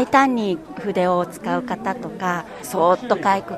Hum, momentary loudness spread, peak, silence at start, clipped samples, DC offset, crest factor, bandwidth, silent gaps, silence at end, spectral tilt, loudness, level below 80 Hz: none; 10 LU; 0 dBFS; 0 s; under 0.1%; under 0.1%; 20 dB; 13.5 kHz; none; 0 s; -5.5 dB/octave; -21 LUFS; -56 dBFS